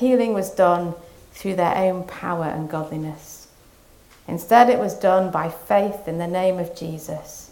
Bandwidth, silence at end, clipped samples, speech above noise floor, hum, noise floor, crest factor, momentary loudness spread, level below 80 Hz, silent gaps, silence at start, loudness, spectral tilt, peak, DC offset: 17.5 kHz; 0.05 s; under 0.1%; 30 dB; none; -51 dBFS; 22 dB; 15 LU; -54 dBFS; none; 0 s; -21 LUFS; -6 dB/octave; 0 dBFS; under 0.1%